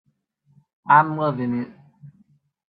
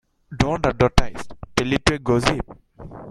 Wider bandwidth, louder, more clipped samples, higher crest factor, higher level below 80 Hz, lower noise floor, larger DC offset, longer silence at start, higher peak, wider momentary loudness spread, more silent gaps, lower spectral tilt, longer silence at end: second, 4.8 kHz vs 14.5 kHz; about the same, -20 LUFS vs -21 LUFS; neither; about the same, 22 dB vs 20 dB; second, -68 dBFS vs -30 dBFS; first, -65 dBFS vs -39 dBFS; neither; first, 0.85 s vs 0.3 s; about the same, -2 dBFS vs 0 dBFS; about the same, 19 LU vs 18 LU; neither; first, -10.5 dB/octave vs -5 dB/octave; first, 0.6 s vs 0 s